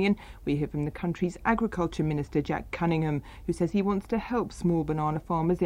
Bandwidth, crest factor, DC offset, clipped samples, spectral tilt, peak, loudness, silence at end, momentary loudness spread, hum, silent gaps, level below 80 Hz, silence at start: 11.5 kHz; 18 dB; under 0.1%; under 0.1%; -7.5 dB/octave; -10 dBFS; -29 LUFS; 0 s; 5 LU; none; none; -46 dBFS; 0 s